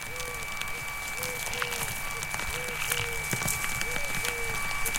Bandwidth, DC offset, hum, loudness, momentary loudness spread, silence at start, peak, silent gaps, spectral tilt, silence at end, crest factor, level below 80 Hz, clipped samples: 17 kHz; under 0.1%; none; -30 LUFS; 5 LU; 0 s; -8 dBFS; none; -1.5 dB/octave; 0 s; 24 dB; -44 dBFS; under 0.1%